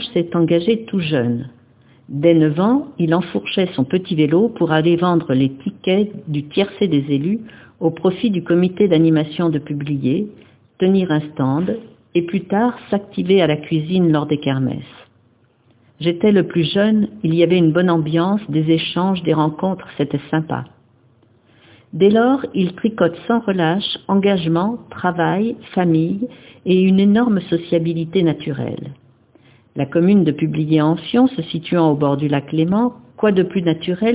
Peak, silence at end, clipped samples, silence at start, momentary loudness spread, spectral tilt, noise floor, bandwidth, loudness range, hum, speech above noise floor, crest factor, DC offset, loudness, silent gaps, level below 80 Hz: 0 dBFS; 0 s; under 0.1%; 0 s; 9 LU; -11.5 dB/octave; -56 dBFS; 4 kHz; 3 LU; none; 39 dB; 16 dB; under 0.1%; -17 LUFS; none; -54 dBFS